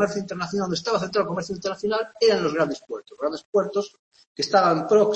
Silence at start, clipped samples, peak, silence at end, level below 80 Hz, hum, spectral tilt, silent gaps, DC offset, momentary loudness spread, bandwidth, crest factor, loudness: 0 s; under 0.1%; -6 dBFS; 0 s; -62 dBFS; none; -4.5 dB/octave; 3.45-3.53 s, 3.99-4.12 s, 4.27-4.35 s; under 0.1%; 10 LU; 8.6 kHz; 18 dB; -24 LUFS